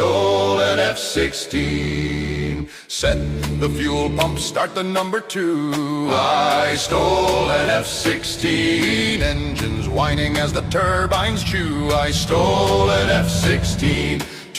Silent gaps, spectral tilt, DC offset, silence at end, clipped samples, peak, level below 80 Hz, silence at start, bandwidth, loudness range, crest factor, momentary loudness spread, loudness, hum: none; -4.5 dB/octave; under 0.1%; 0 s; under 0.1%; -2 dBFS; -32 dBFS; 0 s; 16 kHz; 4 LU; 16 dB; 6 LU; -19 LUFS; none